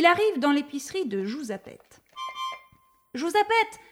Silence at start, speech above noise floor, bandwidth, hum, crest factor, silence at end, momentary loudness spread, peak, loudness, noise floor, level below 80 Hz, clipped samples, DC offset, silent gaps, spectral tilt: 0 s; 35 dB; 16.5 kHz; none; 22 dB; 0.1 s; 16 LU; -4 dBFS; -26 LUFS; -60 dBFS; -70 dBFS; under 0.1%; under 0.1%; none; -3.5 dB/octave